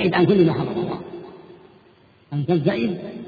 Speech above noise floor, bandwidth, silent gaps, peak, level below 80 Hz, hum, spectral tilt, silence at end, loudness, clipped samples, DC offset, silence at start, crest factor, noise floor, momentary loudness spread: 34 dB; 4.9 kHz; none; -6 dBFS; -56 dBFS; none; -9.5 dB/octave; 0 s; -21 LUFS; under 0.1%; under 0.1%; 0 s; 16 dB; -53 dBFS; 20 LU